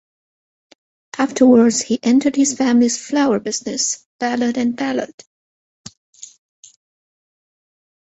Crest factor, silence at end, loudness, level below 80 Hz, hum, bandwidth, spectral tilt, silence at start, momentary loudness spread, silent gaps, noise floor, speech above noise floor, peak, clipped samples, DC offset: 18 dB; 2.9 s; -17 LUFS; -62 dBFS; none; 8.2 kHz; -3.5 dB/octave; 1.15 s; 10 LU; 4.06-4.19 s; under -90 dBFS; over 74 dB; -2 dBFS; under 0.1%; under 0.1%